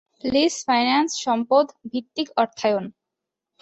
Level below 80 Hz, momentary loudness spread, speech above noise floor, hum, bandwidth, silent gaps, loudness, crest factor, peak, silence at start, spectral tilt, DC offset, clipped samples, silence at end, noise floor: -62 dBFS; 9 LU; 63 dB; none; 8.2 kHz; none; -22 LUFS; 18 dB; -6 dBFS; 0.25 s; -3 dB/octave; under 0.1%; under 0.1%; 0.7 s; -85 dBFS